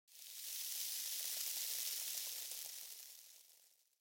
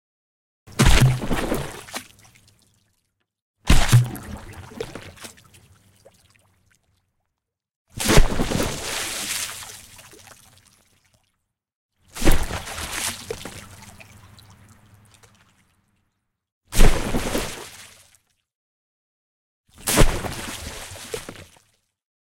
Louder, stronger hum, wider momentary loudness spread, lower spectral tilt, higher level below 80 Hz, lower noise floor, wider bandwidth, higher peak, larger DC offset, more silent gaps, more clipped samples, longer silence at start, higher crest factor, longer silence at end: second, -42 LUFS vs -23 LUFS; neither; second, 15 LU vs 24 LU; second, 5 dB/octave vs -4 dB/octave; second, under -90 dBFS vs -26 dBFS; second, -71 dBFS vs -81 dBFS; about the same, 17 kHz vs 16.5 kHz; second, -24 dBFS vs 0 dBFS; neither; second, none vs 3.42-3.54 s, 7.76-7.85 s, 11.75-11.89 s, 16.52-16.61 s, 18.55-19.64 s; neither; second, 0.1 s vs 0.75 s; about the same, 22 dB vs 22 dB; second, 0.3 s vs 0.9 s